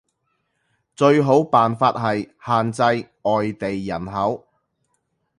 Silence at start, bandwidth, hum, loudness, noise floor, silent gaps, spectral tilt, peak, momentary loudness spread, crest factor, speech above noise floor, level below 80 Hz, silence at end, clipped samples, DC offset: 1 s; 11.5 kHz; none; -20 LUFS; -71 dBFS; none; -6.5 dB/octave; -2 dBFS; 11 LU; 20 dB; 52 dB; -56 dBFS; 1 s; under 0.1%; under 0.1%